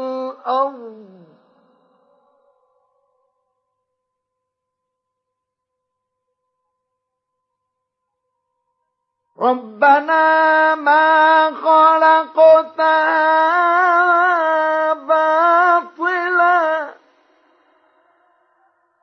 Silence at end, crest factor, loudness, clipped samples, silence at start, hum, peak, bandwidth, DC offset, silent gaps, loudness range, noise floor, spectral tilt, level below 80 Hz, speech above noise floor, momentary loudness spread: 2.1 s; 16 dB; -14 LUFS; under 0.1%; 0 s; none; -2 dBFS; 6.4 kHz; under 0.1%; none; 14 LU; -79 dBFS; -4 dB/octave; -88 dBFS; 66 dB; 9 LU